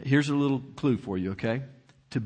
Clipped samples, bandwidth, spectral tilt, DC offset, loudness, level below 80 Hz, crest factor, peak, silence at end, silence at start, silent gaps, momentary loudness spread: under 0.1%; 9.4 kHz; -7 dB/octave; under 0.1%; -28 LUFS; -62 dBFS; 18 dB; -10 dBFS; 0 s; 0 s; none; 10 LU